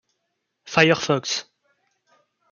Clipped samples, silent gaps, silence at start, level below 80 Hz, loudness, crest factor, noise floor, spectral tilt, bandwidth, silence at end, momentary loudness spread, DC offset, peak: under 0.1%; none; 0.65 s; -64 dBFS; -20 LUFS; 24 dB; -77 dBFS; -4 dB/octave; 7.2 kHz; 1.1 s; 10 LU; under 0.1%; -2 dBFS